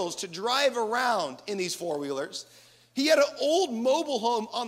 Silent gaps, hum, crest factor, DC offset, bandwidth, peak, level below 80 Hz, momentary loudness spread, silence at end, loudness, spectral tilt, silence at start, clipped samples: none; none; 18 dB; under 0.1%; 16 kHz; -10 dBFS; -80 dBFS; 10 LU; 0 s; -27 LUFS; -2.5 dB/octave; 0 s; under 0.1%